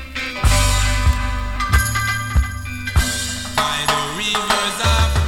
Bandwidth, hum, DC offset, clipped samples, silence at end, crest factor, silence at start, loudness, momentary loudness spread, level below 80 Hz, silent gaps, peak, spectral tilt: 17 kHz; none; under 0.1%; under 0.1%; 0 s; 18 dB; 0 s; -19 LUFS; 6 LU; -22 dBFS; none; -2 dBFS; -3 dB/octave